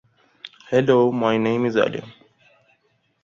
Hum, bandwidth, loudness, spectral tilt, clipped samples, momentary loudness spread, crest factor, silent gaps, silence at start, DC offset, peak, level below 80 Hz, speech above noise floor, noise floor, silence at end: none; 7.6 kHz; -20 LUFS; -7 dB/octave; under 0.1%; 23 LU; 18 dB; none; 0.45 s; under 0.1%; -4 dBFS; -64 dBFS; 47 dB; -66 dBFS; 1.15 s